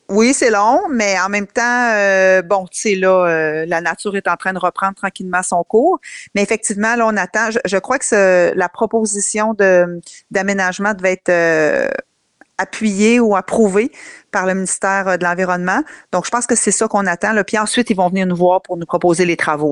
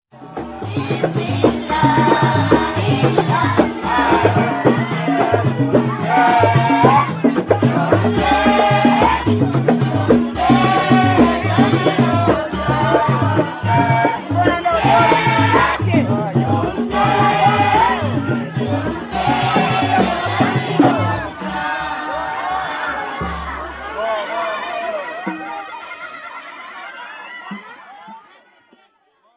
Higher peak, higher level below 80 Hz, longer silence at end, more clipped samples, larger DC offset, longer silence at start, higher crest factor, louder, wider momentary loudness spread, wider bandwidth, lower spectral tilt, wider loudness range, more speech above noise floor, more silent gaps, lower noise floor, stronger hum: about the same, -2 dBFS vs 0 dBFS; second, -54 dBFS vs -38 dBFS; second, 0 s vs 1.15 s; neither; neither; about the same, 0.1 s vs 0.15 s; about the same, 14 dB vs 16 dB; about the same, -15 LUFS vs -16 LUFS; second, 7 LU vs 14 LU; first, 11.5 kHz vs 4 kHz; second, -4 dB/octave vs -10.5 dB/octave; second, 2 LU vs 11 LU; second, 37 dB vs 42 dB; neither; second, -52 dBFS vs -59 dBFS; neither